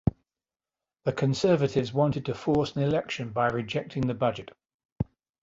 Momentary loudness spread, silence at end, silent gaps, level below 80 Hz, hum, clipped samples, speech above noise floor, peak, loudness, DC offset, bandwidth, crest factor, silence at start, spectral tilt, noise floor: 12 LU; 0.4 s; 4.74-4.79 s, 4.85-4.96 s; -50 dBFS; none; under 0.1%; over 63 dB; -10 dBFS; -28 LUFS; under 0.1%; 7.8 kHz; 18 dB; 0.05 s; -7 dB/octave; under -90 dBFS